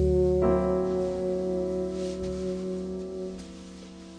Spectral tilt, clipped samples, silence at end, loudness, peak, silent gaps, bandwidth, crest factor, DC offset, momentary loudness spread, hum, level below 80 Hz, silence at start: -8 dB/octave; under 0.1%; 0 s; -29 LUFS; -12 dBFS; none; 10 kHz; 16 dB; under 0.1%; 18 LU; none; -40 dBFS; 0 s